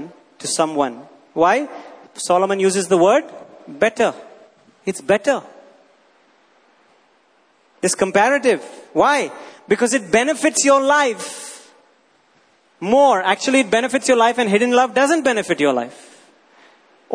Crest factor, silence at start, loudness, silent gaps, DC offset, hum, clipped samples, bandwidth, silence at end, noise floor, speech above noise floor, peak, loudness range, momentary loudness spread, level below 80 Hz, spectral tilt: 18 dB; 0 s; -17 LUFS; none; under 0.1%; none; under 0.1%; 11 kHz; 0 s; -58 dBFS; 41 dB; -2 dBFS; 7 LU; 15 LU; -62 dBFS; -3 dB/octave